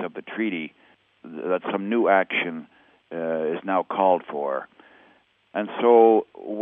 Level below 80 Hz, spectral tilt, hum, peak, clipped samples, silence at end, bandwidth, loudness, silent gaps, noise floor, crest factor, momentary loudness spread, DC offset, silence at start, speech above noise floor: -80 dBFS; -8.5 dB/octave; none; -4 dBFS; under 0.1%; 0 s; 3.8 kHz; -23 LUFS; none; -59 dBFS; 20 dB; 17 LU; under 0.1%; 0 s; 37 dB